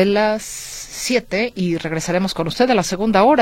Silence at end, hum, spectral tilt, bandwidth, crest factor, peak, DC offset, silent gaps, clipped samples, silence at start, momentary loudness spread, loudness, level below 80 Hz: 0 s; none; -4.5 dB/octave; 16.5 kHz; 16 dB; -2 dBFS; under 0.1%; none; under 0.1%; 0 s; 10 LU; -19 LUFS; -44 dBFS